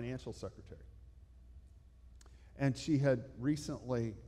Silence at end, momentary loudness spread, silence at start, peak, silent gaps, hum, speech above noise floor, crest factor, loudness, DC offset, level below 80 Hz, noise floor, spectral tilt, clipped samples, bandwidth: 0 s; 23 LU; 0 s; -20 dBFS; none; none; 22 dB; 20 dB; -37 LUFS; under 0.1%; -58 dBFS; -59 dBFS; -7 dB/octave; under 0.1%; 12 kHz